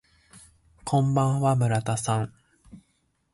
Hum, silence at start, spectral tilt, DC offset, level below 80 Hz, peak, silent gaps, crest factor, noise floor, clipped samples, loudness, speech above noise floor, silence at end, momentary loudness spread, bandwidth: none; 0.35 s; -6.5 dB/octave; under 0.1%; -56 dBFS; -12 dBFS; none; 16 dB; -71 dBFS; under 0.1%; -25 LUFS; 47 dB; 0.55 s; 9 LU; 11.5 kHz